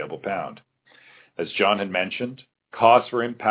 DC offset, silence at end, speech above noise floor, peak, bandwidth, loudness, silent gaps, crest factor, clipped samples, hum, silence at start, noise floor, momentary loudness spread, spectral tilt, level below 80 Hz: under 0.1%; 0 s; 32 dB; -2 dBFS; 4 kHz; -22 LUFS; none; 22 dB; under 0.1%; none; 0 s; -54 dBFS; 18 LU; -8.5 dB/octave; -68 dBFS